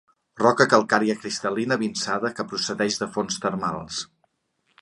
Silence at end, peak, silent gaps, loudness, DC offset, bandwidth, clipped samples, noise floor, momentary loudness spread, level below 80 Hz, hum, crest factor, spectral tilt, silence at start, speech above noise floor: 0.75 s; -2 dBFS; none; -23 LUFS; under 0.1%; 11 kHz; under 0.1%; -71 dBFS; 10 LU; -62 dBFS; none; 24 dB; -3.5 dB/octave; 0.35 s; 48 dB